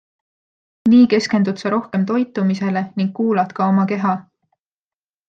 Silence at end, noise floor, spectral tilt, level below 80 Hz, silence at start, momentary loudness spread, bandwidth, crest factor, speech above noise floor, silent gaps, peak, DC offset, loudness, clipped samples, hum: 1.05 s; under -90 dBFS; -7 dB/octave; -64 dBFS; 0.85 s; 9 LU; 7.8 kHz; 16 dB; over 73 dB; none; -4 dBFS; under 0.1%; -18 LUFS; under 0.1%; none